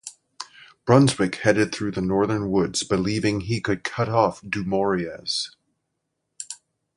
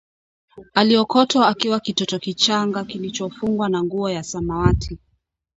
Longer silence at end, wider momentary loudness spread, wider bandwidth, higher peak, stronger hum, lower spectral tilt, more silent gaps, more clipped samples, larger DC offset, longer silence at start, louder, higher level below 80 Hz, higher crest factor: second, 0.4 s vs 0.6 s; first, 20 LU vs 11 LU; first, 11.5 kHz vs 8 kHz; about the same, -2 dBFS vs 0 dBFS; neither; about the same, -5 dB/octave vs -5 dB/octave; neither; neither; neither; second, 0.05 s vs 0.55 s; second, -23 LUFS vs -20 LUFS; second, -52 dBFS vs -36 dBFS; about the same, 20 dB vs 20 dB